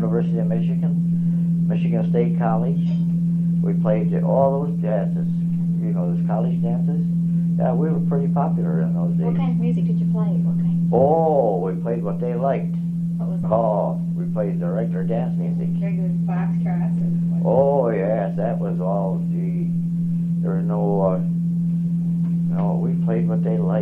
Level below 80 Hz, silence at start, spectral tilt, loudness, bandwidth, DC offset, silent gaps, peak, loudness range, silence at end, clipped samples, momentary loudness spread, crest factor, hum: -50 dBFS; 0 s; -11.5 dB/octave; -21 LUFS; 3.1 kHz; 0.2%; none; -4 dBFS; 3 LU; 0 s; under 0.1%; 5 LU; 16 dB; none